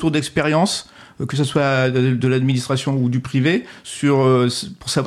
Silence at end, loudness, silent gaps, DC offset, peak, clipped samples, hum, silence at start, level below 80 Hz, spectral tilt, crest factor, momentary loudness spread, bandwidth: 0 s; -18 LUFS; none; under 0.1%; -6 dBFS; under 0.1%; none; 0 s; -52 dBFS; -5.5 dB/octave; 12 dB; 8 LU; 13 kHz